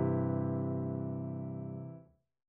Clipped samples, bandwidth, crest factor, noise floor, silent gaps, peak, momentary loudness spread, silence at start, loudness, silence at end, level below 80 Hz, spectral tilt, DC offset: under 0.1%; 2.6 kHz; 16 dB; -57 dBFS; none; -20 dBFS; 13 LU; 0 s; -37 LUFS; 0.45 s; -78 dBFS; -12.5 dB/octave; under 0.1%